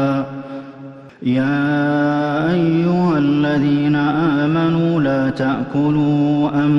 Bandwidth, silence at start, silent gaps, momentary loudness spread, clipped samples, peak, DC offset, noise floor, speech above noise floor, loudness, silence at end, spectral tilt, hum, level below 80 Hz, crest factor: 6.2 kHz; 0 s; none; 11 LU; under 0.1%; -6 dBFS; under 0.1%; -36 dBFS; 21 dB; -17 LUFS; 0 s; -8.5 dB/octave; none; -52 dBFS; 10 dB